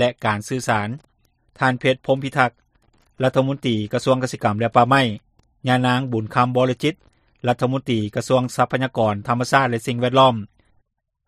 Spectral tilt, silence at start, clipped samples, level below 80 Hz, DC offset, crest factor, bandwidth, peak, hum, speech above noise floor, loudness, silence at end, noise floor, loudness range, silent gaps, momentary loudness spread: -6 dB/octave; 0 s; under 0.1%; -56 dBFS; under 0.1%; 20 dB; 13.5 kHz; 0 dBFS; none; 47 dB; -20 LUFS; 0.85 s; -66 dBFS; 3 LU; none; 7 LU